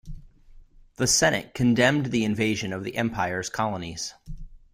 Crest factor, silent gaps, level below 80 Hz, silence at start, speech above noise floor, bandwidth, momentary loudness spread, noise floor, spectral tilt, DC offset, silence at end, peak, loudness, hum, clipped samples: 20 dB; none; -46 dBFS; 0.05 s; 25 dB; 16 kHz; 14 LU; -50 dBFS; -4 dB/octave; under 0.1%; 0.15 s; -6 dBFS; -24 LUFS; none; under 0.1%